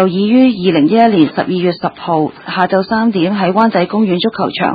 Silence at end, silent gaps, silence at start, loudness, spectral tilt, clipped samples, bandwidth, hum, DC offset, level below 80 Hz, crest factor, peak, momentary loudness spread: 0 s; none; 0 s; -13 LUFS; -9.5 dB/octave; under 0.1%; 5 kHz; none; under 0.1%; -52 dBFS; 12 dB; 0 dBFS; 7 LU